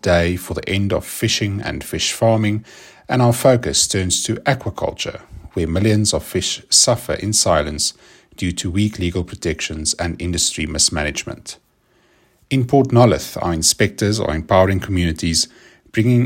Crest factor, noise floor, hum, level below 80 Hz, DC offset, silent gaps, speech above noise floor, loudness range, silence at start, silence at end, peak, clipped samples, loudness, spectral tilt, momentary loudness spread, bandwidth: 18 dB; -58 dBFS; none; -40 dBFS; under 0.1%; none; 41 dB; 4 LU; 0.05 s; 0 s; 0 dBFS; under 0.1%; -18 LUFS; -4 dB/octave; 11 LU; 16.5 kHz